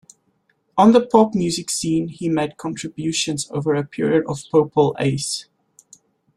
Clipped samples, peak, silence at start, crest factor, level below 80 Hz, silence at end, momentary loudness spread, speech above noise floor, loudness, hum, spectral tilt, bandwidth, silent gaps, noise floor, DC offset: under 0.1%; -2 dBFS; 0.75 s; 18 dB; -56 dBFS; 0.95 s; 12 LU; 47 dB; -19 LUFS; none; -5 dB/octave; 13.5 kHz; none; -66 dBFS; under 0.1%